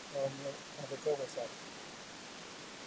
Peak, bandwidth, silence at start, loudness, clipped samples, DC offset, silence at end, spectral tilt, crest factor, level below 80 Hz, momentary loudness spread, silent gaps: -24 dBFS; 8 kHz; 0 s; -42 LUFS; under 0.1%; under 0.1%; 0 s; -3.5 dB/octave; 18 dB; -76 dBFS; 10 LU; none